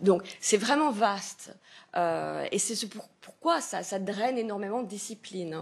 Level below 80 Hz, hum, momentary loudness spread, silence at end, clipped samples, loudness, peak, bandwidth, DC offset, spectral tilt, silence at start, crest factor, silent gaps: -80 dBFS; none; 13 LU; 0 s; under 0.1%; -30 LUFS; -10 dBFS; 13 kHz; under 0.1%; -3.5 dB/octave; 0 s; 20 dB; none